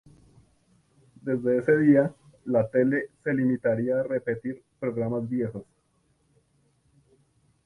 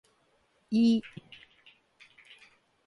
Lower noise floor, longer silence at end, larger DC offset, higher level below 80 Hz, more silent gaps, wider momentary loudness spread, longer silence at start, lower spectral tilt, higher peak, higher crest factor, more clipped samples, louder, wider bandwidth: about the same, -69 dBFS vs -70 dBFS; first, 2.05 s vs 1.8 s; neither; first, -64 dBFS vs -74 dBFS; neither; second, 13 LU vs 27 LU; first, 1.25 s vs 0.7 s; first, -10.5 dB/octave vs -6.5 dB/octave; first, -8 dBFS vs -16 dBFS; about the same, 20 dB vs 18 dB; neither; about the same, -26 LUFS vs -27 LUFS; first, 10.5 kHz vs 7.6 kHz